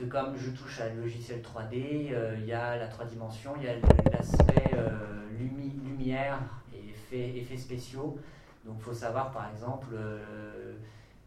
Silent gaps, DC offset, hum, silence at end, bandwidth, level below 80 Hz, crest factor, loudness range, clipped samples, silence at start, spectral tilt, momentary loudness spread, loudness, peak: none; under 0.1%; none; 0.1 s; 12.5 kHz; -38 dBFS; 28 dB; 10 LU; under 0.1%; 0 s; -7.5 dB/octave; 20 LU; -32 LUFS; -4 dBFS